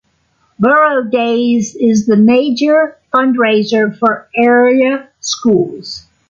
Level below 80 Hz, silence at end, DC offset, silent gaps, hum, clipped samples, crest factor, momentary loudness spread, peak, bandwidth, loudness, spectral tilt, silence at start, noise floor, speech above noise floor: -56 dBFS; 0.3 s; under 0.1%; none; none; under 0.1%; 10 dB; 7 LU; -2 dBFS; 7.6 kHz; -12 LUFS; -5 dB/octave; 0.6 s; -58 dBFS; 47 dB